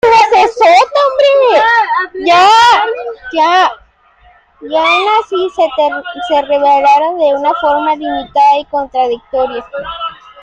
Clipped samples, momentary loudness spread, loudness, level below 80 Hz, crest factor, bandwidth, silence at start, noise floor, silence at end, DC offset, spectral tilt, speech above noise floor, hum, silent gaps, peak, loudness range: under 0.1%; 11 LU; -10 LUFS; -48 dBFS; 10 dB; 10 kHz; 0.05 s; -46 dBFS; 0.3 s; under 0.1%; -2.5 dB/octave; 35 dB; none; none; 0 dBFS; 5 LU